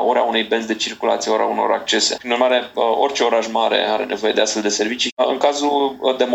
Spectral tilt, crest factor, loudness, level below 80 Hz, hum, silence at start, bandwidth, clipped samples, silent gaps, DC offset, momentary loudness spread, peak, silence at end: -1.5 dB/octave; 18 dB; -18 LUFS; -64 dBFS; none; 0 s; 16 kHz; under 0.1%; 5.12-5.17 s; under 0.1%; 3 LU; 0 dBFS; 0 s